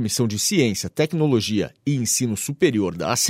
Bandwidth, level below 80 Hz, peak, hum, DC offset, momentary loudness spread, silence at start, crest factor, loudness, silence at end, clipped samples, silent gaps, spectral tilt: 16 kHz; -56 dBFS; -6 dBFS; none; under 0.1%; 5 LU; 0 s; 16 dB; -21 LUFS; 0 s; under 0.1%; none; -4 dB/octave